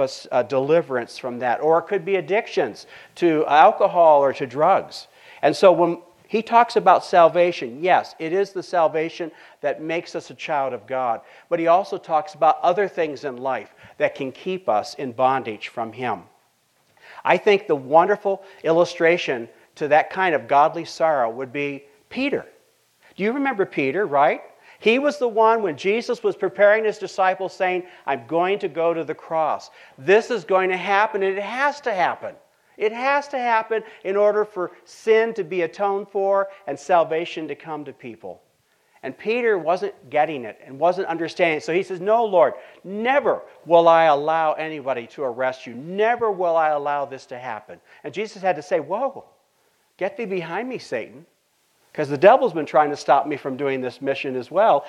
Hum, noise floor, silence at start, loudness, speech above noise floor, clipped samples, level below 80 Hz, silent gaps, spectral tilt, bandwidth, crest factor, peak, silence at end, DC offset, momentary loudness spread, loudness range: none; -65 dBFS; 0 s; -21 LUFS; 44 dB; under 0.1%; -74 dBFS; none; -5.5 dB/octave; 11.5 kHz; 20 dB; -2 dBFS; 0 s; under 0.1%; 14 LU; 7 LU